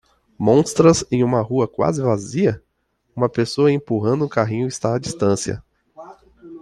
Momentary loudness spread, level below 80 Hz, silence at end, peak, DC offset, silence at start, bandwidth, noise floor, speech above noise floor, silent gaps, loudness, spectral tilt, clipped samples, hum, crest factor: 8 LU; -52 dBFS; 0.05 s; -2 dBFS; under 0.1%; 0.4 s; 12.5 kHz; -68 dBFS; 50 dB; none; -19 LUFS; -6 dB/octave; under 0.1%; none; 18 dB